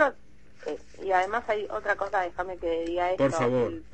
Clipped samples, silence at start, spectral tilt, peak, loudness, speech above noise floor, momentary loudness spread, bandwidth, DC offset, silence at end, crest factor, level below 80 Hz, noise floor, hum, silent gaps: under 0.1%; 0 s; -5.5 dB/octave; -10 dBFS; -28 LUFS; 29 dB; 12 LU; 8.8 kHz; 0.5%; 0.1 s; 18 dB; -54 dBFS; -56 dBFS; none; none